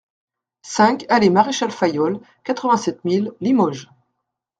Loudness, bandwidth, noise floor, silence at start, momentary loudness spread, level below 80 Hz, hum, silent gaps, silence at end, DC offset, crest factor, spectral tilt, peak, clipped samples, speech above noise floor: -19 LUFS; 9.2 kHz; -77 dBFS; 0.65 s; 11 LU; -64 dBFS; none; none; 0.75 s; under 0.1%; 20 dB; -5 dB/octave; 0 dBFS; under 0.1%; 59 dB